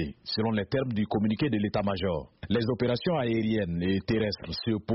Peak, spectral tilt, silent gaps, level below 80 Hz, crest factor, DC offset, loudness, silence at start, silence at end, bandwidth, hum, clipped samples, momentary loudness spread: -14 dBFS; -5.5 dB/octave; none; -52 dBFS; 14 dB; under 0.1%; -29 LUFS; 0 s; 0 s; 5.8 kHz; none; under 0.1%; 4 LU